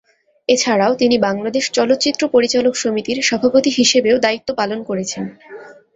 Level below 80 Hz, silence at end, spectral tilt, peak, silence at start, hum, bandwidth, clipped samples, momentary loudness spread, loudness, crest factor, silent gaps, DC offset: -56 dBFS; 0.25 s; -3 dB/octave; -2 dBFS; 0.5 s; none; 8 kHz; under 0.1%; 9 LU; -16 LUFS; 16 dB; none; under 0.1%